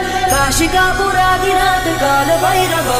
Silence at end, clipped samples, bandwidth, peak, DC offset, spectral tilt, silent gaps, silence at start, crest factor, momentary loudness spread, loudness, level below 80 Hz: 0 s; under 0.1%; 16 kHz; -4 dBFS; under 0.1%; -3 dB/octave; none; 0 s; 10 dB; 1 LU; -13 LUFS; -28 dBFS